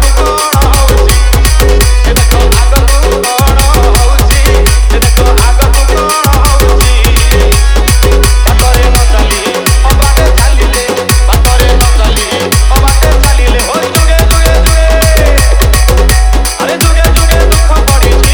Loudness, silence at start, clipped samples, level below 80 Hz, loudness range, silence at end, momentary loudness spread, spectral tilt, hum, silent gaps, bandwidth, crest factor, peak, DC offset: -7 LUFS; 0 s; 0.5%; -6 dBFS; 1 LU; 0 s; 2 LU; -4 dB/octave; none; none; over 20 kHz; 6 dB; 0 dBFS; under 0.1%